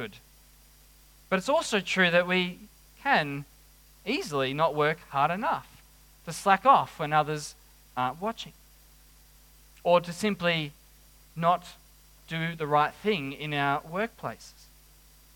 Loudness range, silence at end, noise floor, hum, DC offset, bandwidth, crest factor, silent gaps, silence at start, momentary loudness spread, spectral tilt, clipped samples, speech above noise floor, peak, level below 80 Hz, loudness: 4 LU; 0.85 s; -56 dBFS; none; under 0.1%; 18 kHz; 24 dB; none; 0 s; 17 LU; -4.5 dB/octave; under 0.1%; 29 dB; -6 dBFS; -60 dBFS; -27 LUFS